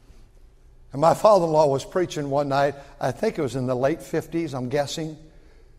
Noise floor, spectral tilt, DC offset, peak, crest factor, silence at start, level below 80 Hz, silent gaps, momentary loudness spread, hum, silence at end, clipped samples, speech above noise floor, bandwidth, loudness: -50 dBFS; -6 dB/octave; under 0.1%; -4 dBFS; 20 dB; 0.45 s; -50 dBFS; none; 12 LU; none; 0.55 s; under 0.1%; 28 dB; 15.5 kHz; -23 LUFS